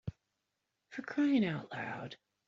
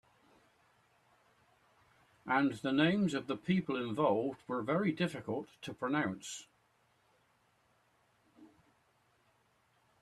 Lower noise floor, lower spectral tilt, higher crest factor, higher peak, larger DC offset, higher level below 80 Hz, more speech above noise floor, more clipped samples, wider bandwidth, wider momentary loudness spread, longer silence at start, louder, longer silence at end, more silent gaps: first, -86 dBFS vs -73 dBFS; about the same, -5.5 dB/octave vs -6 dB/octave; second, 16 dB vs 22 dB; second, -20 dBFS vs -16 dBFS; neither; first, -68 dBFS vs -76 dBFS; first, 51 dB vs 39 dB; neither; second, 7.4 kHz vs 12.5 kHz; first, 18 LU vs 12 LU; second, 0.05 s vs 2.25 s; about the same, -35 LUFS vs -34 LUFS; second, 0.35 s vs 1.55 s; neither